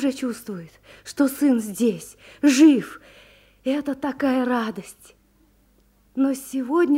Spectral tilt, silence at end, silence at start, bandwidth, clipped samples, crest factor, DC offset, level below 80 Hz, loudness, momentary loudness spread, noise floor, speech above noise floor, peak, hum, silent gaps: -4.5 dB/octave; 0 s; 0 s; 16 kHz; under 0.1%; 18 dB; under 0.1%; -62 dBFS; -22 LUFS; 22 LU; -59 dBFS; 38 dB; -4 dBFS; none; none